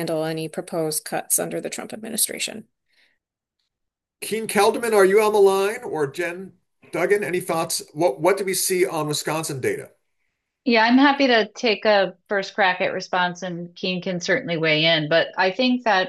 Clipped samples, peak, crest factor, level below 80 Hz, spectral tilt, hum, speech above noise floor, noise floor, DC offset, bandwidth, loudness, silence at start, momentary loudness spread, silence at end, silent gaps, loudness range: under 0.1%; -4 dBFS; 18 dB; -72 dBFS; -3.5 dB/octave; none; 61 dB; -82 dBFS; under 0.1%; 13 kHz; -21 LUFS; 0 s; 12 LU; 0 s; none; 6 LU